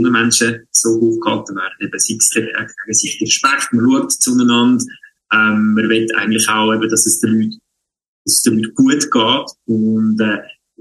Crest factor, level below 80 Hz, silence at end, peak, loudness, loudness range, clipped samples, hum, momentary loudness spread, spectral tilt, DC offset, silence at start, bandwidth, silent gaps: 14 dB; -60 dBFS; 0.35 s; 0 dBFS; -14 LUFS; 2 LU; under 0.1%; none; 8 LU; -2.5 dB/octave; under 0.1%; 0 s; 12.5 kHz; 8.08-8.25 s